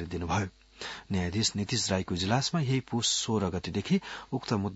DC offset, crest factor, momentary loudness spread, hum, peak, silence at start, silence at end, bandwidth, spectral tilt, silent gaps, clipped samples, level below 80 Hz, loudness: under 0.1%; 20 dB; 9 LU; none; -10 dBFS; 0 s; 0 s; 8 kHz; -4 dB/octave; none; under 0.1%; -58 dBFS; -30 LUFS